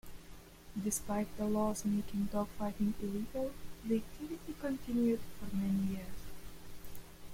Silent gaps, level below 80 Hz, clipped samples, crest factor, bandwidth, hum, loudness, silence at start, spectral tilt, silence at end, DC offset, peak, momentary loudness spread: none; -54 dBFS; under 0.1%; 14 dB; 16.5 kHz; none; -37 LUFS; 0.05 s; -6 dB/octave; 0 s; under 0.1%; -22 dBFS; 19 LU